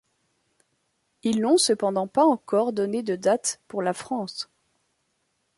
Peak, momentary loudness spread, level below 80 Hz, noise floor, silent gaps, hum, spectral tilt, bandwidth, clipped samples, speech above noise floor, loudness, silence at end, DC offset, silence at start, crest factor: -8 dBFS; 11 LU; -72 dBFS; -73 dBFS; none; none; -4 dB/octave; 11.5 kHz; under 0.1%; 50 dB; -24 LUFS; 1.15 s; under 0.1%; 1.25 s; 18 dB